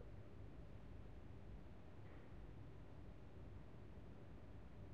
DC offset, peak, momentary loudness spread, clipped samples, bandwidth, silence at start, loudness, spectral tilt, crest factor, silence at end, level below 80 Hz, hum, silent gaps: 0.1%; -44 dBFS; 1 LU; under 0.1%; 7.6 kHz; 0 s; -60 LUFS; -7.5 dB/octave; 12 dB; 0 s; -62 dBFS; none; none